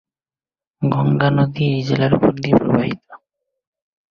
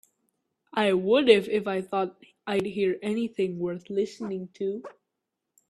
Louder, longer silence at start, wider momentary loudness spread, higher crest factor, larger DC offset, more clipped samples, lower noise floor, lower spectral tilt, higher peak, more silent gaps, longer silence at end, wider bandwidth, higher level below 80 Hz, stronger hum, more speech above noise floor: first, -17 LUFS vs -27 LUFS; about the same, 0.8 s vs 0.75 s; second, 7 LU vs 13 LU; second, 18 dB vs 24 dB; neither; neither; first, under -90 dBFS vs -84 dBFS; first, -8.5 dB/octave vs -6 dB/octave; about the same, -2 dBFS vs -4 dBFS; neither; first, 0.95 s vs 0.8 s; second, 6.8 kHz vs 12.5 kHz; first, -50 dBFS vs -70 dBFS; neither; first, over 74 dB vs 58 dB